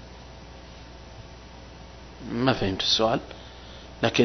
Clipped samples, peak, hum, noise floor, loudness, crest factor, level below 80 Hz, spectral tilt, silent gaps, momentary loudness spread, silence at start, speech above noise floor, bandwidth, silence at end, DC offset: under 0.1%; -4 dBFS; 60 Hz at -45 dBFS; -44 dBFS; -25 LUFS; 24 dB; -46 dBFS; -4.5 dB/octave; none; 23 LU; 0 s; 20 dB; 6.4 kHz; 0 s; under 0.1%